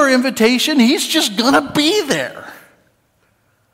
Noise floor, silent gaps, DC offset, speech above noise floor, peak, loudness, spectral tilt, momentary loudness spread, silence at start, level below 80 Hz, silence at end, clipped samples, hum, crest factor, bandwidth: -60 dBFS; none; under 0.1%; 45 dB; -2 dBFS; -14 LUFS; -3 dB/octave; 7 LU; 0 s; -56 dBFS; 1.2 s; under 0.1%; none; 14 dB; 16.5 kHz